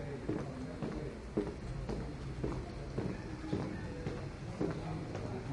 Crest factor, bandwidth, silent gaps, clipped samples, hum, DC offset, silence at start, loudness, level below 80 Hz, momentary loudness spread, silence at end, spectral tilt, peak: 18 dB; 11.5 kHz; none; under 0.1%; none; under 0.1%; 0 s; -41 LUFS; -50 dBFS; 4 LU; 0 s; -7.5 dB/octave; -22 dBFS